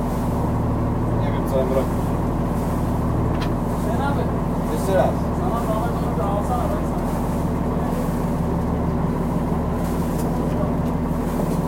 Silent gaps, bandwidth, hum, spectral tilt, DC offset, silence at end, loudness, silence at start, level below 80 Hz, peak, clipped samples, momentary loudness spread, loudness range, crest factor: none; 16.5 kHz; none; -8 dB/octave; under 0.1%; 0 s; -22 LUFS; 0 s; -30 dBFS; -4 dBFS; under 0.1%; 2 LU; 1 LU; 16 dB